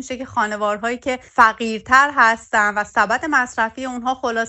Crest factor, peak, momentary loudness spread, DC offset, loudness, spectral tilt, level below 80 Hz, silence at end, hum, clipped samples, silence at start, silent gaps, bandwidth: 18 dB; 0 dBFS; 10 LU; under 0.1%; -18 LUFS; -3 dB/octave; -52 dBFS; 0 s; none; under 0.1%; 0 s; none; 8.8 kHz